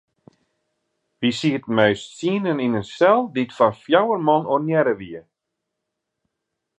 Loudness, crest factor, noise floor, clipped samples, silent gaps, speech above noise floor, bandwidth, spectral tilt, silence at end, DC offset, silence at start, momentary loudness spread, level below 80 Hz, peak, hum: -20 LUFS; 20 dB; -80 dBFS; under 0.1%; none; 61 dB; 10 kHz; -6 dB/octave; 1.6 s; under 0.1%; 1.2 s; 8 LU; -62 dBFS; -2 dBFS; none